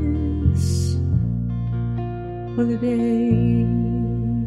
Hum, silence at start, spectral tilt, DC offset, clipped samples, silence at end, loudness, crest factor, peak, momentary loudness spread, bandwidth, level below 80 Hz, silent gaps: none; 0 s; -8.5 dB/octave; under 0.1%; under 0.1%; 0 s; -22 LUFS; 14 dB; -6 dBFS; 7 LU; 12 kHz; -32 dBFS; none